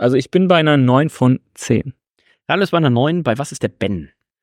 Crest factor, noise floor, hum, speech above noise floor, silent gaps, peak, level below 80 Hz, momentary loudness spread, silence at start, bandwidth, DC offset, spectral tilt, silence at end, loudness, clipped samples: 16 dB; -60 dBFS; none; 44 dB; none; -2 dBFS; -50 dBFS; 10 LU; 0 s; 13.5 kHz; under 0.1%; -6.5 dB/octave; 0.4 s; -16 LUFS; under 0.1%